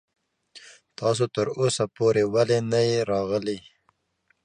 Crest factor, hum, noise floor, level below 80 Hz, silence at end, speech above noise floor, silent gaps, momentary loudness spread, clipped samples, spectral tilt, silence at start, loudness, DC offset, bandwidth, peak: 16 dB; none; -70 dBFS; -62 dBFS; 0.85 s; 47 dB; none; 7 LU; under 0.1%; -5 dB/octave; 0.55 s; -24 LUFS; under 0.1%; 10.5 kHz; -8 dBFS